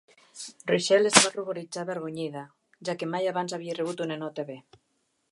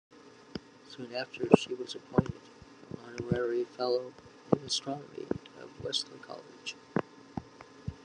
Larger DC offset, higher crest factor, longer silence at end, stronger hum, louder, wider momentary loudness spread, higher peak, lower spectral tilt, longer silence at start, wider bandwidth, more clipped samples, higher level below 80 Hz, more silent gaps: neither; about the same, 28 dB vs 32 dB; first, 0.7 s vs 0.05 s; neither; first, -27 LUFS vs -33 LUFS; about the same, 20 LU vs 19 LU; about the same, 0 dBFS vs -2 dBFS; second, -2.5 dB/octave vs -5 dB/octave; about the same, 0.35 s vs 0.25 s; about the same, 11.5 kHz vs 11 kHz; neither; second, -72 dBFS vs -62 dBFS; neither